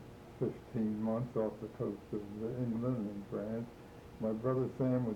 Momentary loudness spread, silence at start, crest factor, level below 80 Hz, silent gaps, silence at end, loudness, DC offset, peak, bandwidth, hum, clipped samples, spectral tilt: 9 LU; 0 s; 16 dB; -62 dBFS; none; 0 s; -38 LUFS; under 0.1%; -20 dBFS; 17.5 kHz; none; under 0.1%; -9.5 dB/octave